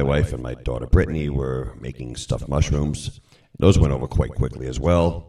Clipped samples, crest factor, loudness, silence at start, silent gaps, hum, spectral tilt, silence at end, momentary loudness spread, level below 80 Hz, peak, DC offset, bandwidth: under 0.1%; 22 dB; -22 LUFS; 0 s; none; none; -7 dB/octave; 0.05 s; 13 LU; -28 dBFS; 0 dBFS; under 0.1%; 11.5 kHz